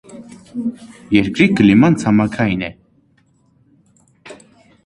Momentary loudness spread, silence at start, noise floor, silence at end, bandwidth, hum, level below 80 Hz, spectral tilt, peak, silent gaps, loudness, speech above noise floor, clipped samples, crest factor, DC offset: 19 LU; 0.1 s; -57 dBFS; 0.5 s; 11 kHz; none; -46 dBFS; -7 dB/octave; 0 dBFS; none; -15 LUFS; 42 dB; under 0.1%; 18 dB; under 0.1%